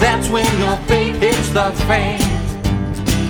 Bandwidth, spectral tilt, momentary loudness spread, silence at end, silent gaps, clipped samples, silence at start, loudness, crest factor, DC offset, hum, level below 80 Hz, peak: over 20 kHz; -5 dB/octave; 5 LU; 0 s; none; under 0.1%; 0 s; -17 LUFS; 14 dB; under 0.1%; none; -26 dBFS; -2 dBFS